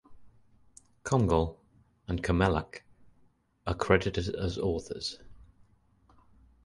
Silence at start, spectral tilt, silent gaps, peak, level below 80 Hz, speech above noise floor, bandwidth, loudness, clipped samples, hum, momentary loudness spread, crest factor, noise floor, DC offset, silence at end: 0.1 s; -6 dB/octave; none; -8 dBFS; -44 dBFS; 38 dB; 11.5 kHz; -30 LUFS; under 0.1%; none; 18 LU; 24 dB; -66 dBFS; under 0.1%; 1.25 s